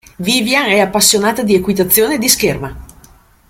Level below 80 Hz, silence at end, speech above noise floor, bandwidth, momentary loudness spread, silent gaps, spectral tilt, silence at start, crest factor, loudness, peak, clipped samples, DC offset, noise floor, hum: -40 dBFS; 0.65 s; 32 dB; over 20 kHz; 6 LU; none; -2.5 dB/octave; 0.2 s; 14 dB; -12 LUFS; 0 dBFS; under 0.1%; under 0.1%; -45 dBFS; none